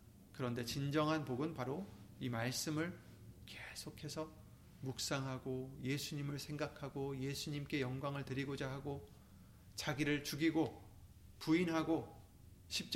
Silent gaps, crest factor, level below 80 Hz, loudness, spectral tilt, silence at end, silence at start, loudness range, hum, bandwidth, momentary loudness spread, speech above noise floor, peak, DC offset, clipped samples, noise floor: none; 18 dB; -66 dBFS; -41 LUFS; -5 dB/octave; 0 s; 0 s; 5 LU; none; 16.5 kHz; 21 LU; 20 dB; -24 dBFS; under 0.1%; under 0.1%; -61 dBFS